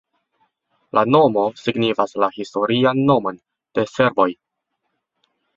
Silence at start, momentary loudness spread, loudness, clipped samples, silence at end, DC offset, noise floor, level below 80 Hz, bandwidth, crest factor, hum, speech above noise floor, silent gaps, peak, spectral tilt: 0.95 s; 9 LU; -19 LUFS; under 0.1%; 1.25 s; under 0.1%; -76 dBFS; -60 dBFS; 7.6 kHz; 20 dB; none; 58 dB; none; 0 dBFS; -6.5 dB/octave